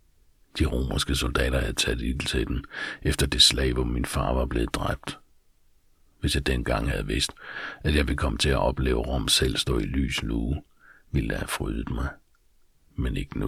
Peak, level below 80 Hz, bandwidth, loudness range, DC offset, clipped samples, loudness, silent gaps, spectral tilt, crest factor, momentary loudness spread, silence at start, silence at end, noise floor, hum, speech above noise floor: -4 dBFS; -32 dBFS; 15.5 kHz; 6 LU; under 0.1%; under 0.1%; -26 LUFS; none; -4 dB/octave; 22 dB; 11 LU; 0.55 s; 0 s; -60 dBFS; none; 35 dB